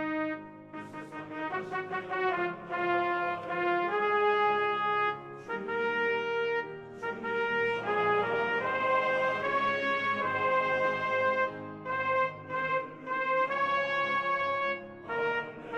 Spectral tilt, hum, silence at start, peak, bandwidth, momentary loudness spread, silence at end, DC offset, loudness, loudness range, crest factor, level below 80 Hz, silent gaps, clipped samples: -5.5 dB/octave; none; 0 s; -16 dBFS; 8.8 kHz; 10 LU; 0 s; under 0.1%; -30 LUFS; 3 LU; 14 dB; -70 dBFS; none; under 0.1%